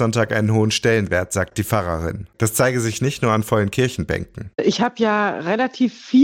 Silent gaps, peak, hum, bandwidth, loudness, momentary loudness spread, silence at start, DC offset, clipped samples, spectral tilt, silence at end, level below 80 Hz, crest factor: none; -6 dBFS; none; 17 kHz; -20 LUFS; 7 LU; 0 s; under 0.1%; under 0.1%; -5 dB/octave; 0 s; -46 dBFS; 14 dB